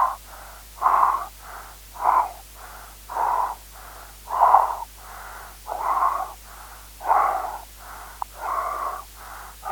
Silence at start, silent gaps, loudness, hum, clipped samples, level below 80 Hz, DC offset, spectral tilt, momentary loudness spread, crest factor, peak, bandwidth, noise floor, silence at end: 0 s; none; -23 LUFS; 50 Hz at -45 dBFS; under 0.1%; -48 dBFS; under 0.1%; -2.5 dB/octave; 21 LU; 26 dB; 0 dBFS; over 20 kHz; -42 dBFS; 0 s